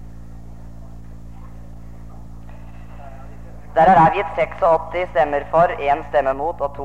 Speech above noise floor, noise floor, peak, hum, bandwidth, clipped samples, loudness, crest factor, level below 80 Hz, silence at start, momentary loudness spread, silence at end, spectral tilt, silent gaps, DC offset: 20 dB; -37 dBFS; -2 dBFS; 50 Hz at -50 dBFS; 8.8 kHz; under 0.1%; -17 LUFS; 18 dB; -40 dBFS; 0 s; 26 LU; 0 s; -7.5 dB/octave; none; 1%